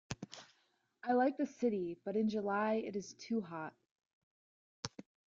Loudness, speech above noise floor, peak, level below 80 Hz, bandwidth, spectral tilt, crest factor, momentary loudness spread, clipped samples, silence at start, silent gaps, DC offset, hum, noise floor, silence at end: -38 LUFS; 41 dB; -18 dBFS; -74 dBFS; 7.8 kHz; -5.5 dB/octave; 20 dB; 15 LU; under 0.1%; 0.1 s; 3.91-3.96 s, 4.06-4.83 s; under 0.1%; none; -78 dBFS; 0.4 s